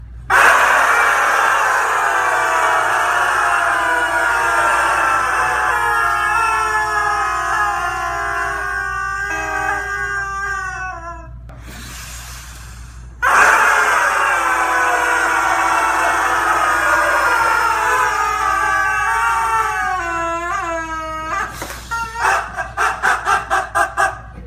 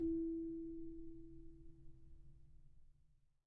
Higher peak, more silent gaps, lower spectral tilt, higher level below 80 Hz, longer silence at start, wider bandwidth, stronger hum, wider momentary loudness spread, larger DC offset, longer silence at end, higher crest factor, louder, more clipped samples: first, 0 dBFS vs -32 dBFS; neither; second, -2 dB/octave vs -13 dB/octave; first, -38 dBFS vs -60 dBFS; about the same, 0 s vs 0 s; first, 15.5 kHz vs 1 kHz; neither; second, 12 LU vs 24 LU; neither; second, 0 s vs 0.35 s; about the same, 16 dB vs 16 dB; first, -15 LUFS vs -47 LUFS; neither